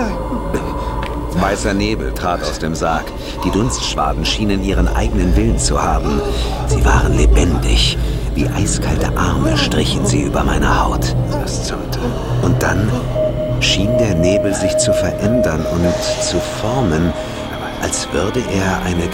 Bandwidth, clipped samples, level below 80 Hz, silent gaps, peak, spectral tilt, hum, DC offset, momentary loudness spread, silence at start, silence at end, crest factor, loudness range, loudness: 16.5 kHz; under 0.1%; -22 dBFS; none; 0 dBFS; -5 dB/octave; none; under 0.1%; 7 LU; 0 s; 0 s; 14 dB; 3 LU; -17 LUFS